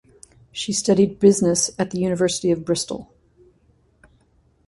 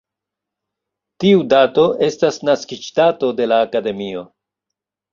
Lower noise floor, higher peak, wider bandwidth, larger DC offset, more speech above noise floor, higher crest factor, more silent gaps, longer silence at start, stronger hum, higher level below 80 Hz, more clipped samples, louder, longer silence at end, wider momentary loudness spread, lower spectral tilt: second, -60 dBFS vs -84 dBFS; about the same, -2 dBFS vs -2 dBFS; first, 11.5 kHz vs 7.4 kHz; neither; second, 41 dB vs 68 dB; about the same, 20 dB vs 16 dB; neither; second, 0.55 s vs 1.2 s; neither; first, -54 dBFS vs -60 dBFS; neither; second, -20 LUFS vs -16 LUFS; first, 1.65 s vs 0.85 s; first, 14 LU vs 11 LU; about the same, -4.5 dB/octave vs -5.5 dB/octave